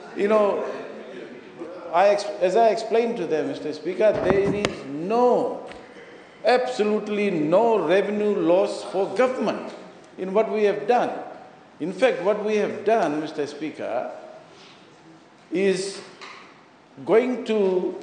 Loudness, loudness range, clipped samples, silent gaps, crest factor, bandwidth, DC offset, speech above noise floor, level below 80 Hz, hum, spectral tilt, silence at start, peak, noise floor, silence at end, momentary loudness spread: -23 LUFS; 5 LU; under 0.1%; none; 22 dB; 9.6 kHz; under 0.1%; 29 dB; -60 dBFS; none; -5.5 dB/octave; 0 s; -2 dBFS; -50 dBFS; 0 s; 19 LU